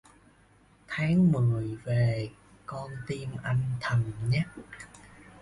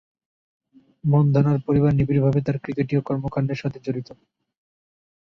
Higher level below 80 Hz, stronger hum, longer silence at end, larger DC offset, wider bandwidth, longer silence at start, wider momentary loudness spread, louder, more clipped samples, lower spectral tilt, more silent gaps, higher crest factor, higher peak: about the same, -54 dBFS vs -50 dBFS; neither; second, 0 s vs 1.1 s; neither; first, 11.5 kHz vs 6 kHz; second, 0.9 s vs 1.05 s; first, 20 LU vs 11 LU; second, -29 LUFS vs -22 LUFS; neither; second, -7.5 dB/octave vs -10 dB/octave; neither; about the same, 14 dB vs 16 dB; second, -14 dBFS vs -6 dBFS